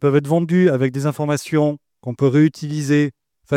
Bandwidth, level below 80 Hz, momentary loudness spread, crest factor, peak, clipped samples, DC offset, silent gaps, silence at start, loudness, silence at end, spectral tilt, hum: 15 kHz; -64 dBFS; 9 LU; 14 dB; -4 dBFS; under 0.1%; under 0.1%; none; 0 s; -18 LUFS; 0 s; -7.5 dB/octave; none